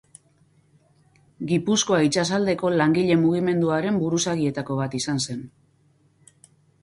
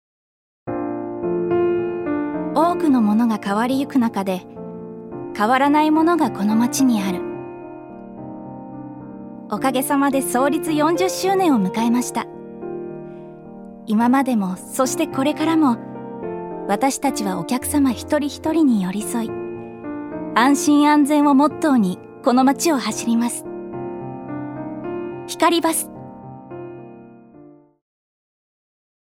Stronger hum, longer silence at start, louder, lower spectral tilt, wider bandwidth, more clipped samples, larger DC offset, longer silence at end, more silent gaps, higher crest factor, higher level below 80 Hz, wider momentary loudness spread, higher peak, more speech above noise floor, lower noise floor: neither; first, 1.4 s vs 0.65 s; second, -22 LUFS vs -19 LUFS; about the same, -5 dB/octave vs -4.5 dB/octave; second, 11.5 kHz vs 16.5 kHz; neither; neither; second, 1.35 s vs 1.65 s; neither; about the same, 16 dB vs 20 dB; about the same, -60 dBFS vs -58 dBFS; second, 8 LU vs 19 LU; second, -8 dBFS vs 0 dBFS; first, 40 dB vs 28 dB; first, -61 dBFS vs -46 dBFS